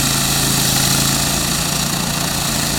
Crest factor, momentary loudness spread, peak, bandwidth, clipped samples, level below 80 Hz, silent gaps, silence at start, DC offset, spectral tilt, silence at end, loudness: 16 dB; 4 LU; 0 dBFS; 19 kHz; under 0.1%; -32 dBFS; none; 0 s; under 0.1%; -2.5 dB/octave; 0 s; -15 LUFS